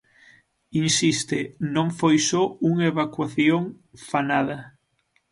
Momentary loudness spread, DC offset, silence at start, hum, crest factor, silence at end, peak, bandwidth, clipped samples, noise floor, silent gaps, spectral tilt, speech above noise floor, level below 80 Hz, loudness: 9 LU; under 0.1%; 0.75 s; none; 16 dB; 0.65 s; -6 dBFS; 11.5 kHz; under 0.1%; -69 dBFS; none; -4.5 dB/octave; 46 dB; -64 dBFS; -23 LUFS